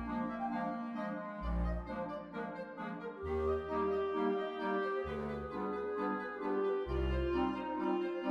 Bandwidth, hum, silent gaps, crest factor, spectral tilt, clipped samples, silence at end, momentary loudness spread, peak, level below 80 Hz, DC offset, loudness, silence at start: 6.6 kHz; none; none; 16 dB; -8.5 dB/octave; under 0.1%; 0 s; 8 LU; -22 dBFS; -46 dBFS; under 0.1%; -38 LUFS; 0 s